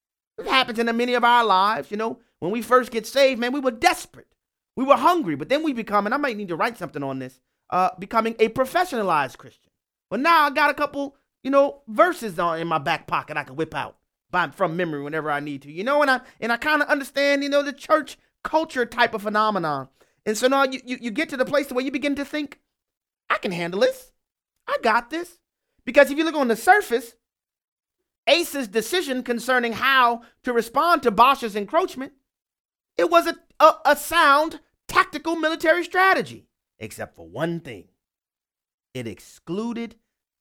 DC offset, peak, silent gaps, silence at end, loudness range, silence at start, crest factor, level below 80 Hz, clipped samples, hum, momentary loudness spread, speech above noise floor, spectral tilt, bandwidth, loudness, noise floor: under 0.1%; 0 dBFS; 22.97-23.01 s, 27.68-27.77 s, 28.18-28.23 s, 32.60-32.69 s, 38.74-38.78 s; 0.5 s; 6 LU; 0.4 s; 22 dB; -60 dBFS; under 0.1%; none; 16 LU; over 68 dB; -4 dB/octave; 18 kHz; -22 LUFS; under -90 dBFS